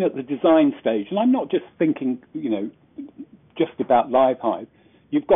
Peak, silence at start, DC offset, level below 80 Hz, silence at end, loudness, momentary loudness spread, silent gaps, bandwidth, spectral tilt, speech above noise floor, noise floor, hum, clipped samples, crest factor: -6 dBFS; 0 s; under 0.1%; -64 dBFS; 0 s; -21 LUFS; 19 LU; none; 3.8 kHz; -5 dB/octave; 23 dB; -43 dBFS; none; under 0.1%; 16 dB